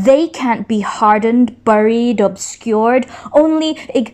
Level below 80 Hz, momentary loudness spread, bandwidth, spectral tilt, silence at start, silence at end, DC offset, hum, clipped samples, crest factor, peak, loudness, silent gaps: -52 dBFS; 6 LU; 12 kHz; -5 dB/octave; 0 s; 0.05 s; under 0.1%; none; under 0.1%; 14 dB; 0 dBFS; -14 LUFS; none